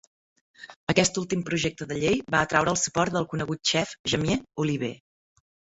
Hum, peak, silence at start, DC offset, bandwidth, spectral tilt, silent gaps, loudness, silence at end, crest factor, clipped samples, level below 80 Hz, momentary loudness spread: none; -4 dBFS; 0.6 s; under 0.1%; 8.2 kHz; -4 dB/octave; 0.76-0.87 s, 3.99-4.04 s; -26 LUFS; 0.8 s; 22 dB; under 0.1%; -54 dBFS; 6 LU